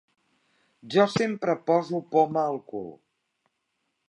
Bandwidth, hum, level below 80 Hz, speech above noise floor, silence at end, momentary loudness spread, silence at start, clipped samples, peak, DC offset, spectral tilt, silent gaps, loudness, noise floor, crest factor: 11 kHz; none; -72 dBFS; 53 dB; 1.15 s; 14 LU; 0.85 s; under 0.1%; -8 dBFS; under 0.1%; -6 dB/octave; none; -25 LUFS; -78 dBFS; 20 dB